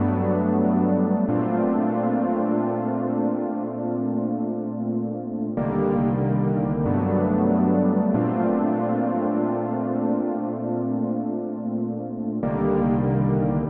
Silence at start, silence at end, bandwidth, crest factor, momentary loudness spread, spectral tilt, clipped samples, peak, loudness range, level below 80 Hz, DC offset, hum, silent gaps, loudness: 0 s; 0 s; 3.3 kHz; 14 dB; 7 LU; -13.5 dB/octave; under 0.1%; -8 dBFS; 4 LU; -50 dBFS; under 0.1%; none; none; -23 LUFS